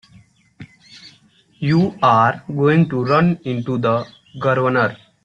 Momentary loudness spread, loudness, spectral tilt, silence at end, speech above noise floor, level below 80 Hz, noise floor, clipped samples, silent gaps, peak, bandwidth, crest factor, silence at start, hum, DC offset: 9 LU; -17 LUFS; -8 dB/octave; 0.3 s; 37 dB; -56 dBFS; -53 dBFS; under 0.1%; none; -2 dBFS; 7.2 kHz; 16 dB; 0.6 s; none; under 0.1%